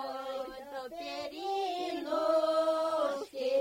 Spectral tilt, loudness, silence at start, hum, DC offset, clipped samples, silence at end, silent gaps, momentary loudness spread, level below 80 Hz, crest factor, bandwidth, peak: -3 dB/octave; -33 LUFS; 0 s; none; under 0.1%; under 0.1%; 0 s; none; 12 LU; -70 dBFS; 14 dB; 16 kHz; -18 dBFS